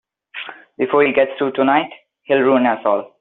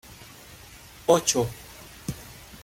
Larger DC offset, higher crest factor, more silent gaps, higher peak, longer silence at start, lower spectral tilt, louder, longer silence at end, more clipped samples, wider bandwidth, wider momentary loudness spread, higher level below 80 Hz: neither; second, 16 dB vs 24 dB; neither; about the same, -2 dBFS vs -4 dBFS; first, 0.35 s vs 0.1 s; about the same, -3 dB/octave vs -3.5 dB/octave; first, -17 LUFS vs -25 LUFS; about the same, 0.15 s vs 0.05 s; neither; second, 4.1 kHz vs 17 kHz; second, 17 LU vs 24 LU; second, -64 dBFS vs -52 dBFS